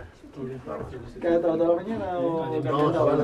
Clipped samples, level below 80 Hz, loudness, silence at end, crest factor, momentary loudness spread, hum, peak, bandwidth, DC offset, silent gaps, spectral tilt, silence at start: under 0.1%; -52 dBFS; -26 LUFS; 0 s; 16 dB; 15 LU; none; -10 dBFS; 10 kHz; under 0.1%; none; -8.5 dB/octave; 0 s